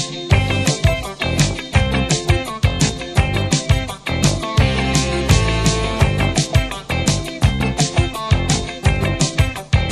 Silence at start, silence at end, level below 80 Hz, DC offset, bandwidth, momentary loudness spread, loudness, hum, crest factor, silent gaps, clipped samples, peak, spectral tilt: 0 s; 0 s; -24 dBFS; 0.1%; 14.5 kHz; 3 LU; -18 LUFS; none; 16 dB; none; under 0.1%; 0 dBFS; -4.5 dB/octave